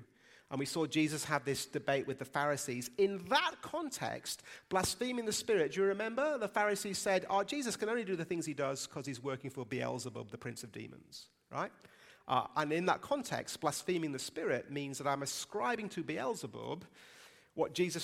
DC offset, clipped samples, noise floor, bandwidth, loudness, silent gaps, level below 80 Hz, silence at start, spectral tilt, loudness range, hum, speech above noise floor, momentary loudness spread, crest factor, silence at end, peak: under 0.1%; under 0.1%; -63 dBFS; 16 kHz; -36 LUFS; none; -72 dBFS; 0 s; -4 dB/octave; 6 LU; none; 26 dB; 12 LU; 22 dB; 0 s; -14 dBFS